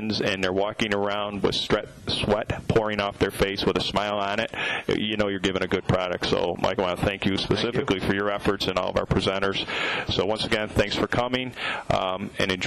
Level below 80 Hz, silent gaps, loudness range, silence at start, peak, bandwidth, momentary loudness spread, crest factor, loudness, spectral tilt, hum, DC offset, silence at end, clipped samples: -44 dBFS; none; 0 LU; 0 s; -12 dBFS; 14.5 kHz; 3 LU; 12 dB; -25 LUFS; -5 dB/octave; none; under 0.1%; 0 s; under 0.1%